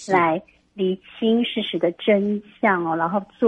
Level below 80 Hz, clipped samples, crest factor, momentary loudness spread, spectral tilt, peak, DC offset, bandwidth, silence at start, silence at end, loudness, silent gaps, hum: -64 dBFS; under 0.1%; 18 dB; 6 LU; -6 dB/octave; -4 dBFS; under 0.1%; 9.2 kHz; 0 s; 0 s; -22 LUFS; none; none